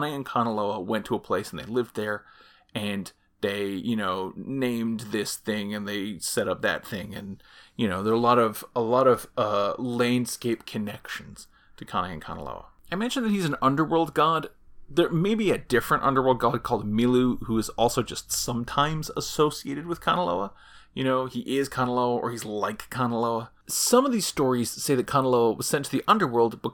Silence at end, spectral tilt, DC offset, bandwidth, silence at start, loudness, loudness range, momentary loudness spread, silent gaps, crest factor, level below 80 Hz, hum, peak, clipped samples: 0 s; -4.5 dB/octave; under 0.1%; 19 kHz; 0 s; -26 LUFS; 6 LU; 12 LU; none; 20 dB; -54 dBFS; none; -6 dBFS; under 0.1%